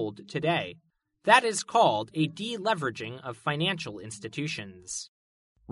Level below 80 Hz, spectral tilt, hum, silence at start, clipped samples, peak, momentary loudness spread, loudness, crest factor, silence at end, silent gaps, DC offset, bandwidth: -70 dBFS; -4 dB/octave; none; 0 s; under 0.1%; -4 dBFS; 16 LU; -28 LUFS; 26 dB; 0 s; 5.08-5.55 s; under 0.1%; 11.5 kHz